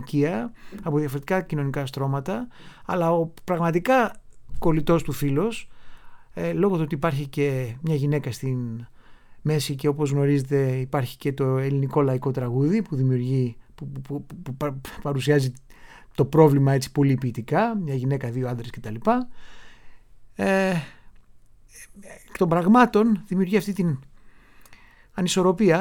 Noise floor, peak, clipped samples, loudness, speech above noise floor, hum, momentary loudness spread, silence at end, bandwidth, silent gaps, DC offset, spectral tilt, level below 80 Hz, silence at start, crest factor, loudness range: -50 dBFS; -2 dBFS; under 0.1%; -24 LUFS; 27 dB; none; 14 LU; 0 s; 17.5 kHz; none; under 0.1%; -7 dB/octave; -48 dBFS; 0 s; 22 dB; 5 LU